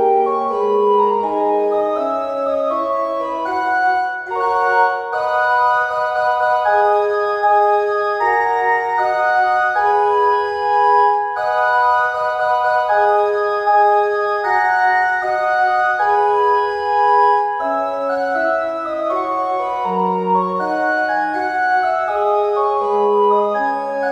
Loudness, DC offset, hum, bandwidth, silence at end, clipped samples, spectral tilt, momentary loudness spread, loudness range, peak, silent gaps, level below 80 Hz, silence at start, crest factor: -16 LUFS; under 0.1%; none; 9.4 kHz; 0 s; under 0.1%; -5 dB/octave; 5 LU; 3 LU; -2 dBFS; none; -58 dBFS; 0 s; 14 dB